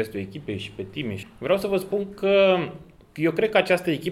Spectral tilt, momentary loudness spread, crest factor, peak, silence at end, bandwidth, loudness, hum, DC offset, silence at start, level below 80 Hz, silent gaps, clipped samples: -6 dB/octave; 14 LU; 20 dB; -4 dBFS; 0 s; 15.5 kHz; -24 LUFS; none; under 0.1%; 0 s; -58 dBFS; none; under 0.1%